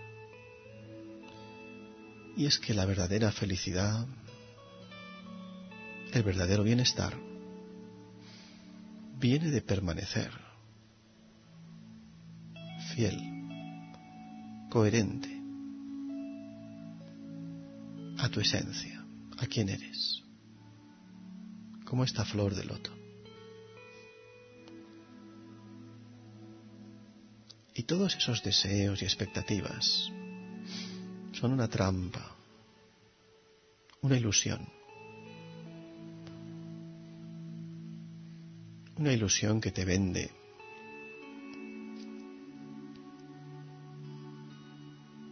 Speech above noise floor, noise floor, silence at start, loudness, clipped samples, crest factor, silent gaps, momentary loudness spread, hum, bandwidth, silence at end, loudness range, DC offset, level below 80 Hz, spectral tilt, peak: 33 dB; -64 dBFS; 0 s; -33 LUFS; under 0.1%; 24 dB; none; 23 LU; none; 6.4 kHz; 0 s; 15 LU; under 0.1%; -60 dBFS; -5 dB/octave; -12 dBFS